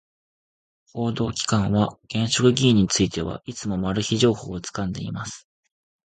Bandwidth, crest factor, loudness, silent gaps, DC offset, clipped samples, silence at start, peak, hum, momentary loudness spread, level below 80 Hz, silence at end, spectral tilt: 9.4 kHz; 20 dB; -23 LUFS; none; under 0.1%; under 0.1%; 0.95 s; -4 dBFS; none; 13 LU; -46 dBFS; 0.75 s; -5 dB/octave